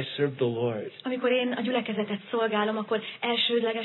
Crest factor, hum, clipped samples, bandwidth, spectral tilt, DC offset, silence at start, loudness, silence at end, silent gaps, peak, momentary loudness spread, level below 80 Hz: 16 dB; none; under 0.1%; 4.3 kHz; -8 dB/octave; under 0.1%; 0 s; -28 LUFS; 0 s; none; -12 dBFS; 6 LU; -84 dBFS